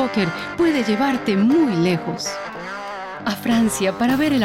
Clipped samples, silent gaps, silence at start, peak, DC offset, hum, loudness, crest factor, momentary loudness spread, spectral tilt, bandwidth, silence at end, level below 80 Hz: under 0.1%; none; 0 s; -10 dBFS; under 0.1%; none; -20 LUFS; 10 dB; 12 LU; -5 dB/octave; 16.5 kHz; 0 s; -50 dBFS